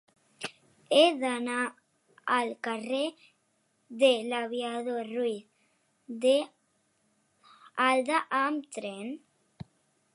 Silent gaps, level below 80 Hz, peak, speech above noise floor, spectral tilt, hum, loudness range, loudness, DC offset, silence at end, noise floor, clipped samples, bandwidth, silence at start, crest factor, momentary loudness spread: none; -78 dBFS; -8 dBFS; 45 dB; -3 dB/octave; none; 3 LU; -29 LUFS; under 0.1%; 0.95 s; -73 dBFS; under 0.1%; 11.5 kHz; 0.4 s; 22 dB; 18 LU